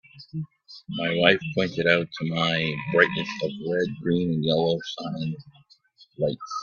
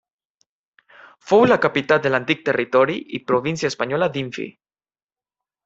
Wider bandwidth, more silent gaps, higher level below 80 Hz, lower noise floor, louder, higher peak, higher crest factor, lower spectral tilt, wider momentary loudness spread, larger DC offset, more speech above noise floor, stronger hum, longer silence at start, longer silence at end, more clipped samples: second, 7 kHz vs 8 kHz; neither; about the same, -60 dBFS vs -62 dBFS; second, -57 dBFS vs under -90 dBFS; second, -24 LUFS vs -19 LUFS; about the same, -2 dBFS vs -2 dBFS; about the same, 24 dB vs 20 dB; about the same, -6 dB/octave vs -5.5 dB/octave; first, 15 LU vs 12 LU; neither; second, 32 dB vs over 71 dB; neither; second, 0.15 s vs 1.25 s; second, 0 s vs 1.15 s; neither